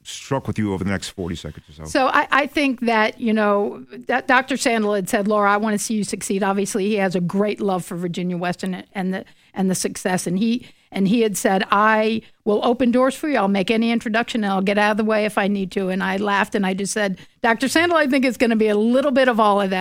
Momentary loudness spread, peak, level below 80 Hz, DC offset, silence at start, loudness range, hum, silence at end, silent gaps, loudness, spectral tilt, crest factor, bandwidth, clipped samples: 9 LU; -2 dBFS; -54 dBFS; under 0.1%; 0.05 s; 4 LU; none; 0 s; none; -20 LUFS; -5 dB/octave; 18 dB; 16.5 kHz; under 0.1%